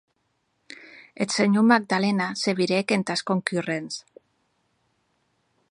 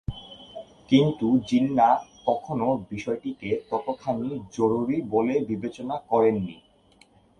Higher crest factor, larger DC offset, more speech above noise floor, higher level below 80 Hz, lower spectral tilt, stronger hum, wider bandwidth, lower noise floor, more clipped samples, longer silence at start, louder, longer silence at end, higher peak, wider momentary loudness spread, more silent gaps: first, 24 dB vs 18 dB; neither; first, 50 dB vs 34 dB; second, -74 dBFS vs -54 dBFS; second, -5 dB/octave vs -7.5 dB/octave; neither; first, 11 kHz vs 9.2 kHz; first, -73 dBFS vs -58 dBFS; neither; first, 0.8 s vs 0.1 s; about the same, -23 LUFS vs -25 LUFS; first, 1.7 s vs 0.85 s; first, -2 dBFS vs -6 dBFS; first, 17 LU vs 14 LU; neither